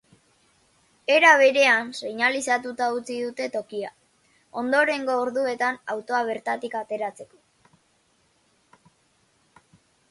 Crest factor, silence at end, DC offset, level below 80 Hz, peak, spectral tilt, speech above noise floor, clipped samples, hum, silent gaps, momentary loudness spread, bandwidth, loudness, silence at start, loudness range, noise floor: 22 dB; 2.85 s; under 0.1%; -74 dBFS; -2 dBFS; -2 dB/octave; 42 dB; under 0.1%; none; none; 16 LU; 11.5 kHz; -23 LUFS; 1.1 s; 14 LU; -65 dBFS